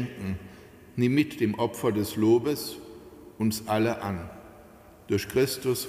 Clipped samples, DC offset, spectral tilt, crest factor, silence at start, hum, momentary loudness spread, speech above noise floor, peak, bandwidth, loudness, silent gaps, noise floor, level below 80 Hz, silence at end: under 0.1%; under 0.1%; -5.5 dB/octave; 16 dB; 0 s; none; 19 LU; 25 dB; -12 dBFS; 16 kHz; -27 LUFS; none; -51 dBFS; -56 dBFS; 0 s